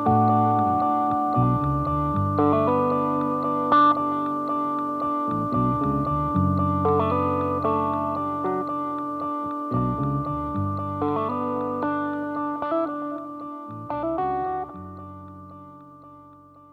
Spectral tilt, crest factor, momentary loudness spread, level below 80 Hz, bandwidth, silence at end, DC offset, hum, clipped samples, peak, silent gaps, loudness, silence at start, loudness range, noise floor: -9.5 dB/octave; 16 dB; 12 LU; -46 dBFS; 5 kHz; 0.35 s; under 0.1%; none; under 0.1%; -8 dBFS; none; -24 LUFS; 0 s; 7 LU; -49 dBFS